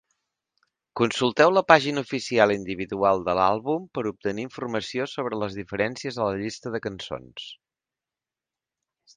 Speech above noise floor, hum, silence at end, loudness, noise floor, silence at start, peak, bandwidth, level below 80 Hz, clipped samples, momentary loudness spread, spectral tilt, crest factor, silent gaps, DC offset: 66 dB; none; 1.6 s; -24 LUFS; -90 dBFS; 0.95 s; 0 dBFS; 9.8 kHz; -60 dBFS; under 0.1%; 14 LU; -5 dB/octave; 26 dB; none; under 0.1%